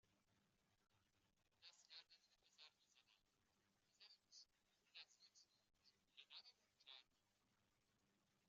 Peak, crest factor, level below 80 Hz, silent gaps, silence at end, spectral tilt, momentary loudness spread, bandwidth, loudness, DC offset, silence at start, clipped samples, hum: -48 dBFS; 26 dB; under -90 dBFS; none; 0 s; 1.5 dB/octave; 6 LU; 7.4 kHz; -66 LUFS; under 0.1%; 0.05 s; under 0.1%; none